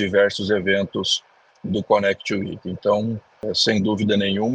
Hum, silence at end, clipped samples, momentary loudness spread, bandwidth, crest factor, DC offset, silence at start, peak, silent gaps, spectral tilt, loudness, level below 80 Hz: none; 0 s; under 0.1%; 8 LU; 9.6 kHz; 18 dB; under 0.1%; 0 s; -4 dBFS; none; -4.5 dB/octave; -21 LUFS; -56 dBFS